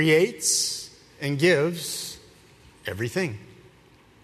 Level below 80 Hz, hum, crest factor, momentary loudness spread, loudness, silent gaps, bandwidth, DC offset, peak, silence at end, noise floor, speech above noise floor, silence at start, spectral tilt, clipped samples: -62 dBFS; none; 20 dB; 17 LU; -24 LUFS; none; 13.5 kHz; under 0.1%; -6 dBFS; 0.7 s; -55 dBFS; 32 dB; 0 s; -3.5 dB/octave; under 0.1%